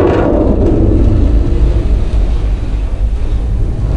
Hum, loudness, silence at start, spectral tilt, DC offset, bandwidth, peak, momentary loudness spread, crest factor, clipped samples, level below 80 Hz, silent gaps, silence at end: none; -14 LUFS; 0 s; -9.5 dB/octave; under 0.1%; 5 kHz; 0 dBFS; 7 LU; 10 dB; under 0.1%; -12 dBFS; none; 0 s